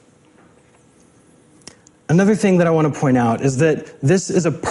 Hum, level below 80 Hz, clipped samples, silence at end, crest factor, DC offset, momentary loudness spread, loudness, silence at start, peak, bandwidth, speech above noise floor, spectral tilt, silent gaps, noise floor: none; -54 dBFS; under 0.1%; 0 s; 16 dB; under 0.1%; 4 LU; -17 LUFS; 2.1 s; -4 dBFS; 11.5 kHz; 36 dB; -6.5 dB/octave; none; -52 dBFS